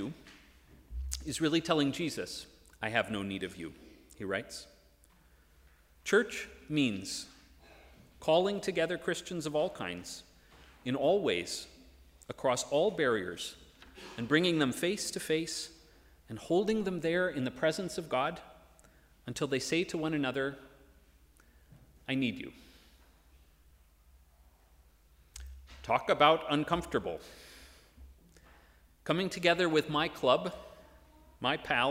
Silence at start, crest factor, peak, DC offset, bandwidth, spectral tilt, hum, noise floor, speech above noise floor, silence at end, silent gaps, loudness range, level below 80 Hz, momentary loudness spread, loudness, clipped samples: 0 s; 26 dB; -8 dBFS; under 0.1%; 16 kHz; -4 dB/octave; none; -63 dBFS; 31 dB; 0 s; none; 7 LU; -58 dBFS; 19 LU; -32 LUFS; under 0.1%